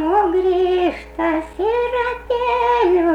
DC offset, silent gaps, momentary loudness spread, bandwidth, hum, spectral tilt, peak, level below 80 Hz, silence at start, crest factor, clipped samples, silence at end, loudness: under 0.1%; none; 6 LU; 8.2 kHz; none; -6 dB/octave; -6 dBFS; -40 dBFS; 0 s; 12 dB; under 0.1%; 0 s; -18 LUFS